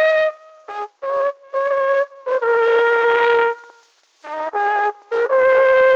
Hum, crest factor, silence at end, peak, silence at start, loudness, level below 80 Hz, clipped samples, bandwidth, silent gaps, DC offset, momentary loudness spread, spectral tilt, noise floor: none; 14 dB; 0 s; -4 dBFS; 0 s; -17 LUFS; -64 dBFS; under 0.1%; 7.2 kHz; none; under 0.1%; 13 LU; -2.5 dB/octave; -54 dBFS